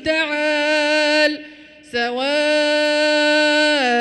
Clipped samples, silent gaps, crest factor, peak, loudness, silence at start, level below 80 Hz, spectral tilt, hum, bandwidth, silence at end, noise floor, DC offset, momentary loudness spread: under 0.1%; none; 12 dB; -6 dBFS; -17 LUFS; 0 s; -60 dBFS; -1.5 dB/octave; none; 11.5 kHz; 0 s; -41 dBFS; under 0.1%; 7 LU